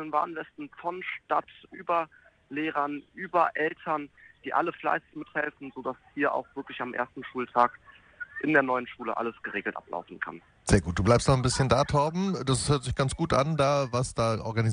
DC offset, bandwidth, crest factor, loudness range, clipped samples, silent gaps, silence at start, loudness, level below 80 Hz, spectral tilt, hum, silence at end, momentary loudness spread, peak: under 0.1%; 10 kHz; 20 dB; 6 LU; under 0.1%; none; 0 s; -28 LUFS; -48 dBFS; -5.5 dB/octave; none; 0 s; 13 LU; -8 dBFS